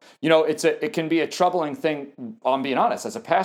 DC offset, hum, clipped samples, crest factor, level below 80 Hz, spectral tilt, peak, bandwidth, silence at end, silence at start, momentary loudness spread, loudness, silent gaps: under 0.1%; none; under 0.1%; 18 dB; -82 dBFS; -4.5 dB/octave; -4 dBFS; 16 kHz; 0 s; 0.2 s; 9 LU; -23 LUFS; none